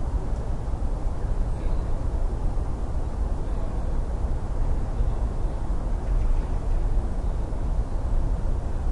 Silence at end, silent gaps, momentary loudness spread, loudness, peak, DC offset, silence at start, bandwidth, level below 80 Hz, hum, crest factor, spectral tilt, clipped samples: 0 s; none; 3 LU; -30 LUFS; -12 dBFS; under 0.1%; 0 s; 9.2 kHz; -24 dBFS; none; 12 dB; -8 dB/octave; under 0.1%